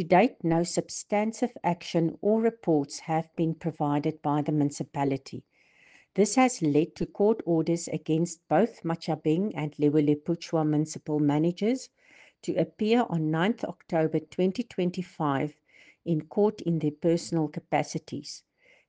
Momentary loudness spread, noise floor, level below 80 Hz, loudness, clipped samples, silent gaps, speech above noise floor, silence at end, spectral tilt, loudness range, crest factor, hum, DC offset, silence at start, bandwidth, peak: 8 LU; -59 dBFS; -66 dBFS; -28 LUFS; under 0.1%; none; 33 dB; 0.5 s; -6.5 dB/octave; 3 LU; 20 dB; none; under 0.1%; 0 s; 9.8 kHz; -8 dBFS